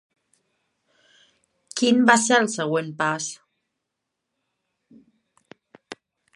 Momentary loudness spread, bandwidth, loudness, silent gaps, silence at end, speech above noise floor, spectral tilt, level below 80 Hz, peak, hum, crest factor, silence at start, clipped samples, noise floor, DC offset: 27 LU; 11.5 kHz; -21 LUFS; none; 0.4 s; 61 dB; -3 dB/octave; -78 dBFS; -2 dBFS; none; 24 dB; 1.75 s; under 0.1%; -81 dBFS; under 0.1%